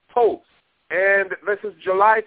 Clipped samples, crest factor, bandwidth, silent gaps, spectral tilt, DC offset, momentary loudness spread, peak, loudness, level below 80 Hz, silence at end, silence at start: under 0.1%; 16 dB; 4 kHz; none; -7.5 dB/octave; under 0.1%; 9 LU; -4 dBFS; -20 LUFS; -64 dBFS; 0.05 s; 0.15 s